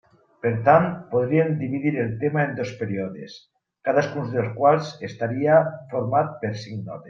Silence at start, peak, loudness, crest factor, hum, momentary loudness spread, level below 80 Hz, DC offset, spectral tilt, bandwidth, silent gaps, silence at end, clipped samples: 0.45 s; -2 dBFS; -23 LUFS; 20 dB; none; 12 LU; -62 dBFS; under 0.1%; -8 dB/octave; 7.4 kHz; none; 0 s; under 0.1%